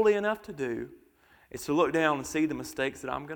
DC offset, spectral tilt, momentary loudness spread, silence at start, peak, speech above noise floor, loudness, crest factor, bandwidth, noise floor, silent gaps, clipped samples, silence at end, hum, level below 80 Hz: under 0.1%; -5 dB/octave; 14 LU; 0 s; -10 dBFS; 33 dB; -30 LUFS; 20 dB; 19.5 kHz; -62 dBFS; none; under 0.1%; 0 s; none; -62 dBFS